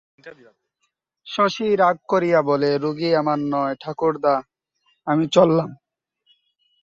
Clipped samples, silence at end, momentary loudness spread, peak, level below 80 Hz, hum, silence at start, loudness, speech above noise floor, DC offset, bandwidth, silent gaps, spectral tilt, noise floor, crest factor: under 0.1%; 1.1 s; 8 LU; -2 dBFS; -64 dBFS; none; 0.25 s; -20 LUFS; 54 dB; under 0.1%; 7.8 kHz; none; -6.5 dB/octave; -74 dBFS; 20 dB